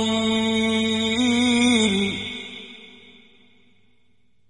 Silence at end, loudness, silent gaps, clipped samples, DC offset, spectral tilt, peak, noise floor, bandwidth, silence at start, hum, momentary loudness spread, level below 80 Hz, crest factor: 1.6 s; -20 LUFS; none; under 0.1%; 0.2%; -3.5 dB/octave; -6 dBFS; -67 dBFS; 11.5 kHz; 0 s; none; 19 LU; -56 dBFS; 16 dB